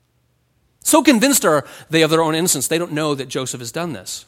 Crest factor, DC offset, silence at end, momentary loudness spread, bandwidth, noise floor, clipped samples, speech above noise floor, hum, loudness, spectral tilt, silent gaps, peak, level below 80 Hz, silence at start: 18 dB; under 0.1%; 0.05 s; 12 LU; 17 kHz; -63 dBFS; under 0.1%; 46 dB; none; -17 LUFS; -3.5 dB/octave; none; -2 dBFS; -58 dBFS; 0.85 s